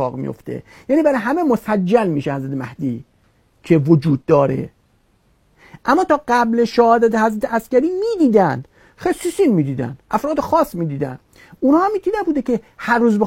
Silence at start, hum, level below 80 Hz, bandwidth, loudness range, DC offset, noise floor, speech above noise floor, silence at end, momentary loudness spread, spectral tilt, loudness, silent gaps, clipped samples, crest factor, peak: 0 s; none; -50 dBFS; 16.5 kHz; 3 LU; under 0.1%; -58 dBFS; 42 dB; 0 s; 12 LU; -7.5 dB/octave; -17 LUFS; none; under 0.1%; 16 dB; 0 dBFS